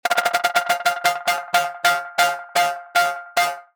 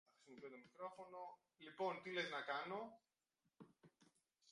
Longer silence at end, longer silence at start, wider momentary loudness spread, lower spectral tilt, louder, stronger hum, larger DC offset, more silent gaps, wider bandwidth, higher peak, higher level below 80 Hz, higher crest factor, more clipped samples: first, 0.15 s vs 0 s; second, 0.05 s vs 0.2 s; second, 2 LU vs 22 LU; second, 0 dB/octave vs -4.5 dB/octave; first, -20 LUFS vs -49 LUFS; neither; neither; neither; first, over 20 kHz vs 11 kHz; first, 0 dBFS vs -32 dBFS; first, -80 dBFS vs under -90 dBFS; about the same, 20 dB vs 20 dB; neither